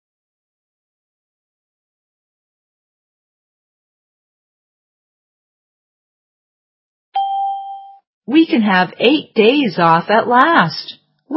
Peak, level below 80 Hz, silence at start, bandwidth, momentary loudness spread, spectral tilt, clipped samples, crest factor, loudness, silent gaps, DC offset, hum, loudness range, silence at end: 0 dBFS; -74 dBFS; 7.15 s; 5.8 kHz; 15 LU; -8 dB/octave; under 0.1%; 18 dB; -14 LUFS; 8.07-8.21 s; under 0.1%; none; 14 LU; 0 s